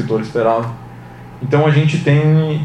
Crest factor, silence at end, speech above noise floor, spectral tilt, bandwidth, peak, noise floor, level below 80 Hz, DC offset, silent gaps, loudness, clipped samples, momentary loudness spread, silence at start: 14 dB; 0 s; 20 dB; -8 dB/octave; 8.6 kHz; -2 dBFS; -34 dBFS; -48 dBFS; under 0.1%; none; -14 LUFS; under 0.1%; 22 LU; 0 s